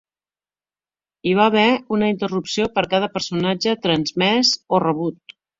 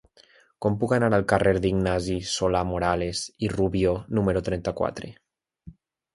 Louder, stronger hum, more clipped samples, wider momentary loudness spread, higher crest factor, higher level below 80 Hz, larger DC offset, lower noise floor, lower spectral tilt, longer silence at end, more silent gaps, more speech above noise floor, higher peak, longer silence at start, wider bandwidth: first, -19 LUFS vs -25 LUFS; first, 50 Hz at -45 dBFS vs none; neither; about the same, 7 LU vs 8 LU; about the same, 18 dB vs 22 dB; second, -56 dBFS vs -44 dBFS; neither; first, under -90 dBFS vs -58 dBFS; about the same, -4.5 dB/octave vs -5.5 dB/octave; about the same, 0.45 s vs 0.45 s; neither; first, over 71 dB vs 33 dB; about the same, -2 dBFS vs -4 dBFS; first, 1.25 s vs 0.6 s; second, 7.8 kHz vs 11.5 kHz